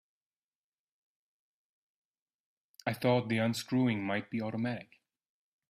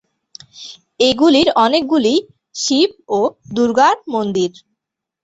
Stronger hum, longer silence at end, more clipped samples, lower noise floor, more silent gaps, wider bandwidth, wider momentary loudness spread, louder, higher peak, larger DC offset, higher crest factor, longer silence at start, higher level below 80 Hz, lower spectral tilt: neither; first, 0.9 s vs 0.75 s; neither; first, under -90 dBFS vs -79 dBFS; neither; first, 15.5 kHz vs 8.2 kHz; second, 8 LU vs 19 LU; second, -33 LUFS vs -15 LUFS; second, -16 dBFS vs -2 dBFS; neither; about the same, 20 dB vs 16 dB; first, 2.85 s vs 0.55 s; second, -76 dBFS vs -54 dBFS; first, -6 dB/octave vs -3.5 dB/octave